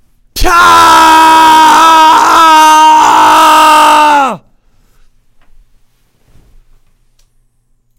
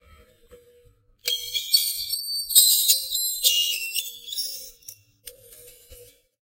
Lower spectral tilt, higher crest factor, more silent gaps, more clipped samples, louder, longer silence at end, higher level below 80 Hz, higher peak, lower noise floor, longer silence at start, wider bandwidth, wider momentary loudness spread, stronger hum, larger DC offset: first, -1.5 dB/octave vs 4 dB/octave; second, 6 dB vs 26 dB; neither; first, 7% vs under 0.1%; first, -3 LUFS vs -20 LUFS; first, 3.6 s vs 0.4 s; first, -28 dBFS vs -62 dBFS; about the same, 0 dBFS vs 0 dBFS; second, -53 dBFS vs -58 dBFS; second, 0.35 s vs 0.5 s; first, 18.5 kHz vs 16 kHz; second, 7 LU vs 15 LU; neither; neither